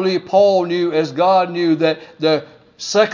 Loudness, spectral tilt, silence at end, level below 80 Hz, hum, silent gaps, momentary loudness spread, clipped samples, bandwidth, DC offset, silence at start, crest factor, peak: -16 LUFS; -5 dB/octave; 0 s; -66 dBFS; none; none; 6 LU; under 0.1%; 7.6 kHz; under 0.1%; 0 s; 14 dB; -2 dBFS